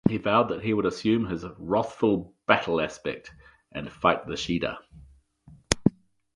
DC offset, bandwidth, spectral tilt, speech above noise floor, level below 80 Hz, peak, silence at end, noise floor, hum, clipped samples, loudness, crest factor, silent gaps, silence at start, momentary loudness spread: under 0.1%; 11.5 kHz; -5 dB/octave; 28 dB; -50 dBFS; -2 dBFS; 0.45 s; -55 dBFS; none; under 0.1%; -26 LUFS; 24 dB; none; 0.05 s; 11 LU